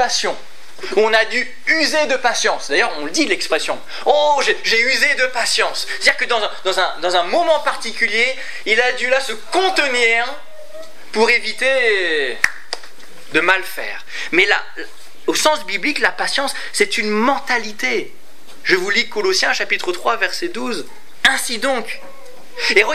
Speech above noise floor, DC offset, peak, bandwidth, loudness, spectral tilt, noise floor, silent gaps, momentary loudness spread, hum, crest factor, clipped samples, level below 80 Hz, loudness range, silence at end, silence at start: 24 dB; 5%; 0 dBFS; 16 kHz; -17 LUFS; -1 dB/octave; -41 dBFS; none; 12 LU; none; 18 dB; under 0.1%; -62 dBFS; 3 LU; 0 s; 0 s